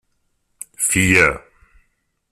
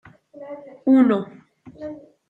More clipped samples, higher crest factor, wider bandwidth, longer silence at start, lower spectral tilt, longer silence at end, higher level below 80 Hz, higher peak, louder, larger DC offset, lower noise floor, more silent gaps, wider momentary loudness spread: neither; about the same, 20 dB vs 16 dB; first, 15 kHz vs 4.1 kHz; first, 0.8 s vs 0.4 s; second, -3.5 dB/octave vs -8.5 dB/octave; first, 0.95 s vs 0.3 s; first, -44 dBFS vs -68 dBFS; first, -2 dBFS vs -6 dBFS; first, -15 LUFS vs -18 LUFS; neither; first, -67 dBFS vs -41 dBFS; neither; about the same, 24 LU vs 22 LU